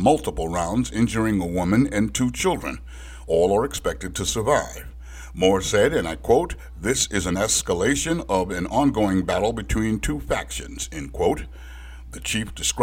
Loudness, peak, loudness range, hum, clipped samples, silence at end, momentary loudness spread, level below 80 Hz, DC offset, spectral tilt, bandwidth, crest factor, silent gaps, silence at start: -23 LUFS; -4 dBFS; 3 LU; none; under 0.1%; 0 s; 13 LU; -36 dBFS; under 0.1%; -4.5 dB/octave; 17 kHz; 18 dB; none; 0 s